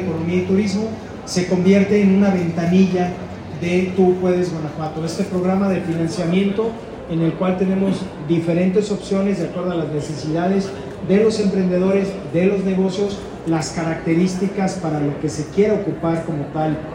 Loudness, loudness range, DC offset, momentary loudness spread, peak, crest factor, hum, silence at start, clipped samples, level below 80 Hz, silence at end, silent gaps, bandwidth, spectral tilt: -19 LUFS; 3 LU; under 0.1%; 9 LU; -4 dBFS; 16 dB; none; 0 s; under 0.1%; -46 dBFS; 0 s; none; 10 kHz; -7 dB/octave